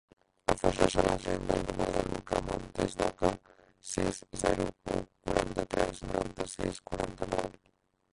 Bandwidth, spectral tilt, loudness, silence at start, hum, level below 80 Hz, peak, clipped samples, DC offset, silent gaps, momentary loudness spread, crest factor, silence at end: 11.5 kHz; -5 dB/octave; -33 LUFS; 0.5 s; none; -46 dBFS; -8 dBFS; under 0.1%; under 0.1%; none; 8 LU; 26 dB; 0.6 s